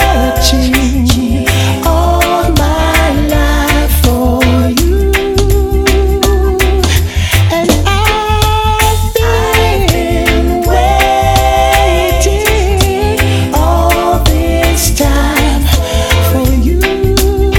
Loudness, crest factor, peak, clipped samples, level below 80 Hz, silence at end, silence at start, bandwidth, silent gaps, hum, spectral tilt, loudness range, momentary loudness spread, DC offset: -10 LUFS; 10 dB; 0 dBFS; under 0.1%; -14 dBFS; 0 s; 0 s; 18.5 kHz; none; none; -5 dB/octave; 1 LU; 2 LU; under 0.1%